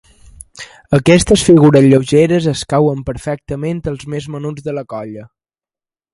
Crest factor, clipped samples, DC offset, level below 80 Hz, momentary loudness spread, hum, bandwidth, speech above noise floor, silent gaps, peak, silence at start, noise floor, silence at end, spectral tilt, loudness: 14 dB; under 0.1%; under 0.1%; -38 dBFS; 19 LU; none; 11.5 kHz; over 77 dB; none; 0 dBFS; 0.55 s; under -90 dBFS; 0.9 s; -6 dB/octave; -13 LUFS